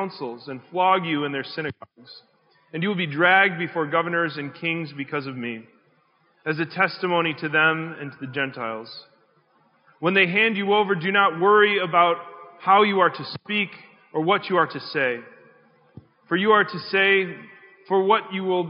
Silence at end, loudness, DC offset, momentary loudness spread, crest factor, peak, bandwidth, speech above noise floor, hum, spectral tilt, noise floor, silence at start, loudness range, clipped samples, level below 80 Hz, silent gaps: 0 s; -22 LUFS; under 0.1%; 16 LU; 20 dB; -4 dBFS; 5.4 kHz; 41 dB; none; -2.5 dB/octave; -63 dBFS; 0 s; 6 LU; under 0.1%; -76 dBFS; none